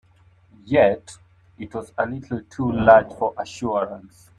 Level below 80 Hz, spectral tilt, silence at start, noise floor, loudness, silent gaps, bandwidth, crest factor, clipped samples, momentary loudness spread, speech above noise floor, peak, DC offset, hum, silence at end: -50 dBFS; -6.5 dB/octave; 0.65 s; -55 dBFS; -21 LUFS; none; 10.5 kHz; 20 dB; under 0.1%; 18 LU; 34 dB; -2 dBFS; under 0.1%; none; 0.4 s